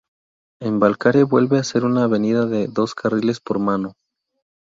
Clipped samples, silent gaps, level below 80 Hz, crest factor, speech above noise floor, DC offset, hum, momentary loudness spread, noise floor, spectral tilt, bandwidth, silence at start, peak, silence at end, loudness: under 0.1%; none; -58 dBFS; 18 dB; over 72 dB; under 0.1%; none; 8 LU; under -90 dBFS; -6.5 dB/octave; 7.6 kHz; 0.6 s; -2 dBFS; 0.75 s; -19 LUFS